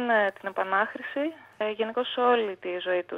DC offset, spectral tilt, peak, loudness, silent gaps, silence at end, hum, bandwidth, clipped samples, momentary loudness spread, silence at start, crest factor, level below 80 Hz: under 0.1%; -5.5 dB/octave; -10 dBFS; -28 LUFS; none; 0 s; none; 5.4 kHz; under 0.1%; 9 LU; 0 s; 16 dB; -82 dBFS